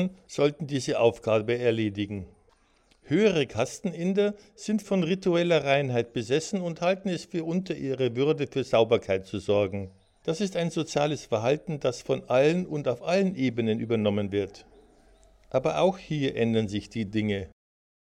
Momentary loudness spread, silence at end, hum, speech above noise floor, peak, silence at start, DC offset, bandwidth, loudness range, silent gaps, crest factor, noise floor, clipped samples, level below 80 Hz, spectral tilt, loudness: 8 LU; 0.6 s; none; 37 dB; -8 dBFS; 0 s; under 0.1%; 11.5 kHz; 2 LU; none; 18 dB; -64 dBFS; under 0.1%; -60 dBFS; -6 dB/octave; -27 LUFS